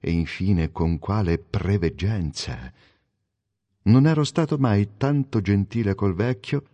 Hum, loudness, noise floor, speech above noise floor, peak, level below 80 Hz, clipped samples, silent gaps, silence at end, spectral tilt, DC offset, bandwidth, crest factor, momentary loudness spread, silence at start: none; -23 LUFS; -78 dBFS; 56 dB; -6 dBFS; -36 dBFS; under 0.1%; none; 0.15 s; -7.5 dB/octave; under 0.1%; 9.8 kHz; 16 dB; 8 LU; 0.05 s